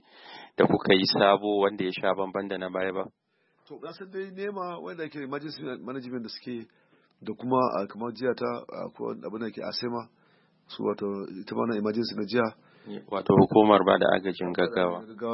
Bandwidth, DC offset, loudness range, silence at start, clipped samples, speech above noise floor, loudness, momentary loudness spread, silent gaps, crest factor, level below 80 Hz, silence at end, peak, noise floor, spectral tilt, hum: 5.8 kHz; under 0.1%; 12 LU; 0.25 s; under 0.1%; 37 dB; -27 LUFS; 18 LU; none; 24 dB; -68 dBFS; 0 s; -4 dBFS; -64 dBFS; -9 dB/octave; none